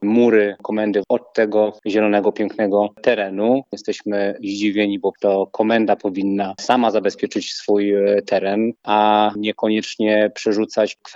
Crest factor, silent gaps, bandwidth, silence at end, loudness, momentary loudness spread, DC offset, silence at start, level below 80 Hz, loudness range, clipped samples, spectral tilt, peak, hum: 18 dB; none; 8 kHz; 0 s; -19 LUFS; 6 LU; under 0.1%; 0 s; -74 dBFS; 2 LU; under 0.1%; -5.5 dB/octave; -2 dBFS; none